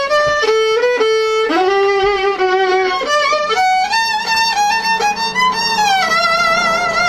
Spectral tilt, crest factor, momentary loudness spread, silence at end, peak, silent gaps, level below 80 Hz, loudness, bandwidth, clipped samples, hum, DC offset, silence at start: -2 dB/octave; 12 dB; 2 LU; 0 s; -2 dBFS; none; -46 dBFS; -13 LUFS; 14 kHz; under 0.1%; none; under 0.1%; 0 s